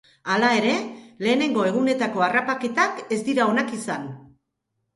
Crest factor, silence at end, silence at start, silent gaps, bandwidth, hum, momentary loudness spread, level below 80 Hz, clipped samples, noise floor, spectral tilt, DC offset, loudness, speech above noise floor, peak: 18 dB; 0.7 s; 0.25 s; none; 11.5 kHz; none; 10 LU; -68 dBFS; under 0.1%; -77 dBFS; -4.5 dB/octave; under 0.1%; -22 LUFS; 55 dB; -6 dBFS